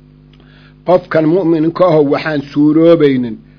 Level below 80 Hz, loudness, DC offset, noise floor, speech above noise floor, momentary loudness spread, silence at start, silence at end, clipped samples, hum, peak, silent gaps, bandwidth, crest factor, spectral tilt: -48 dBFS; -11 LUFS; under 0.1%; -41 dBFS; 31 dB; 8 LU; 0.85 s; 0.2 s; 0.4%; 50 Hz at -35 dBFS; 0 dBFS; none; 5.4 kHz; 12 dB; -9 dB/octave